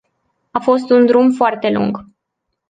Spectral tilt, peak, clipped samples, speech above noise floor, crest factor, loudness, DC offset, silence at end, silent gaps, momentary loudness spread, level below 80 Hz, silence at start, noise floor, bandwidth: -7 dB/octave; -2 dBFS; under 0.1%; 62 dB; 14 dB; -14 LUFS; under 0.1%; 0.7 s; none; 11 LU; -58 dBFS; 0.55 s; -76 dBFS; 9 kHz